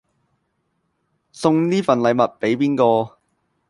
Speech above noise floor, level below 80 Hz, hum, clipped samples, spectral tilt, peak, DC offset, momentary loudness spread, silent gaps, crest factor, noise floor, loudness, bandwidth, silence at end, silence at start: 53 dB; -64 dBFS; none; under 0.1%; -6.5 dB/octave; -2 dBFS; under 0.1%; 5 LU; none; 18 dB; -70 dBFS; -18 LUFS; 11.5 kHz; 0.6 s; 1.35 s